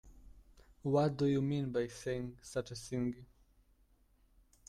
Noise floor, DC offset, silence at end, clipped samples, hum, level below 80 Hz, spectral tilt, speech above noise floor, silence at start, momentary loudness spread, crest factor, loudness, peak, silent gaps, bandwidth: -70 dBFS; under 0.1%; 1.45 s; under 0.1%; none; -62 dBFS; -7 dB/octave; 34 dB; 0.05 s; 10 LU; 18 dB; -37 LUFS; -20 dBFS; none; 13 kHz